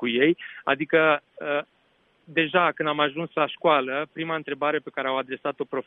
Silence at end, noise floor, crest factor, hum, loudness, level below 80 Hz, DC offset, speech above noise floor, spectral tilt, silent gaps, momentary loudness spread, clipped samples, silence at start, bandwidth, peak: 0.05 s; -65 dBFS; 18 dB; none; -25 LUFS; -72 dBFS; under 0.1%; 40 dB; -8 dB/octave; none; 9 LU; under 0.1%; 0 s; 4.1 kHz; -6 dBFS